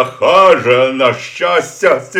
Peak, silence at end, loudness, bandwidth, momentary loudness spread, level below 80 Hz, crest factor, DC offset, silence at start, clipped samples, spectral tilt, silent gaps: 0 dBFS; 0 s; -11 LUFS; 14.5 kHz; 6 LU; -56 dBFS; 12 dB; under 0.1%; 0 s; 0.3%; -4 dB/octave; none